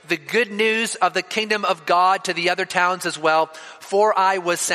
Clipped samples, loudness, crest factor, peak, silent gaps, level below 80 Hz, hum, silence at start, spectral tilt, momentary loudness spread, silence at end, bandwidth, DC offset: under 0.1%; -20 LUFS; 18 dB; -2 dBFS; none; -74 dBFS; none; 0.1 s; -2.5 dB/octave; 5 LU; 0 s; 15.5 kHz; under 0.1%